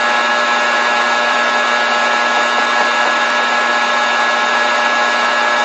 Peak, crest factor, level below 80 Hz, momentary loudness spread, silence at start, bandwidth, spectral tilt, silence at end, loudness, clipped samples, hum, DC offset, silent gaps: -2 dBFS; 12 dB; -66 dBFS; 0 LU; 0 s; 9 kHz; 0 dB/octave; 0 s; -13 LUFS; under 0.1%; none; under 0.1%; none